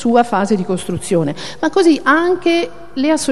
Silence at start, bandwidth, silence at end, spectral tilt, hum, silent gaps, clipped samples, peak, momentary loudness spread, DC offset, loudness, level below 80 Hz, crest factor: 0 s; 12.5 kHz; 0 s; -5 dB/octave; none; none; under 0.1%; 0 dBFS; 8 LU; 2%; -15 LUFS; -48 dBFS; 14 dB